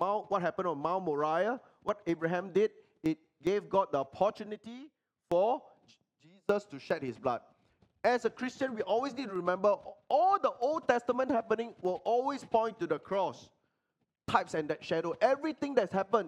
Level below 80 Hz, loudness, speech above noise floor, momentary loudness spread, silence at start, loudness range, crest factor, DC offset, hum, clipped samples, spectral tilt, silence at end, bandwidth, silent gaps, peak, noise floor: -72 dBFS; -32 LUFS; 51 dB; 7 LU; 0 s; 4 LU; 22 dB; under 0.1%; none; under 0.1%; -6 dB/octave; 0 s; 11 kHz; none; -10 dBFS; -83 dBFS